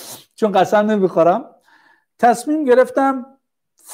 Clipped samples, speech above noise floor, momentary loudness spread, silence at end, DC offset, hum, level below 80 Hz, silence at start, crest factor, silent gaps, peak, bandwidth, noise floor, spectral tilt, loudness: under 0.1%; 45 dB; 8 LU; 0 s; under 0.1%; none; -70 dBFS; 0 s; 14 dB; none; -2 dBFS; 16 kHz; -60 dBFS; -5.5 dB/octave; -16 LUFS